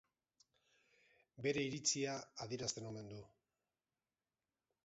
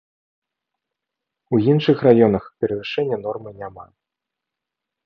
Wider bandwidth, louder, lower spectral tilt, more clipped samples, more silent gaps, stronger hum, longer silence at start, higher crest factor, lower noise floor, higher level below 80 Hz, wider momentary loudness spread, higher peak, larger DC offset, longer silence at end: first, 7.6 kHz vs 6.2 kHz; second, -42 LUFS vs -18 LUFS; second, -3.5 dB/octave vs -9.5 dB/octave; neither; neither; neither; second, 1.35 s vs 1.5 s; about the same, 22 dB vs 20 dB; first, under -90 dBFS vs -84 dBFS; second, -78 dBFS vs -56 dBFS; second, 14 LU vs 19 LU; second, -24 dBFS vs -2 dBFS; neither; first, 1.6 s vs 1.2 s